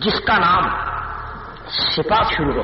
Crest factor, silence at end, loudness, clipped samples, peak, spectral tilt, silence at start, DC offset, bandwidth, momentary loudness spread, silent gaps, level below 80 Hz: 12 dB; 0 s; -18 LUFS; under 0.1%; -6 dBFS; -2 dB/octave; 0 s; under 0.1%; 5.8 kHz; 15 LU; none; -36 dBFS